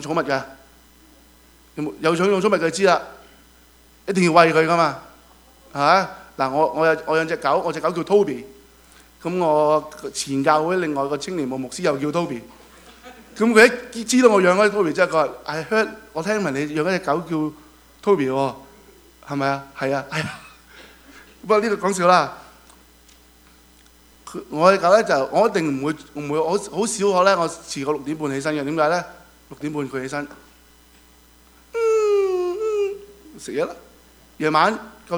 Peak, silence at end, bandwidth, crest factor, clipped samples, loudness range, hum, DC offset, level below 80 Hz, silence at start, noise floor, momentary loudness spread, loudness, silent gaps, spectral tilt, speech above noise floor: 0 dBFS; 0 s; over 20 kHz; 22 dB; under 0.1%; 7 LU; none; under 0.1%; -56 dBFS; 0 s; -51 dBFS; 14 LU; -20 LUFS; none; -4.5 dB/octave; 32 dB